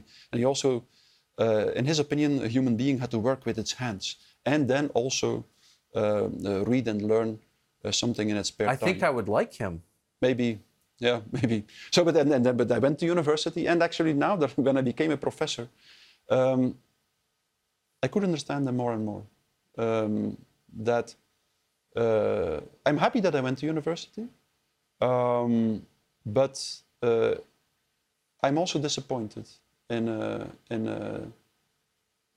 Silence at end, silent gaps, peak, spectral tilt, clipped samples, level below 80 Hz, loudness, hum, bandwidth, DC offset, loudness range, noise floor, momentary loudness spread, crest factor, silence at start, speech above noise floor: 1.05 s; none; -8 dBFS; -5.5 dB/octave; under 0.1%; -64 dBFS; -27 LUFS; none; 13.5 kHz; under 0.1%; 6 LU; -78 dBFS; 11 LU; 20 dB; 0.35 s; 51 dB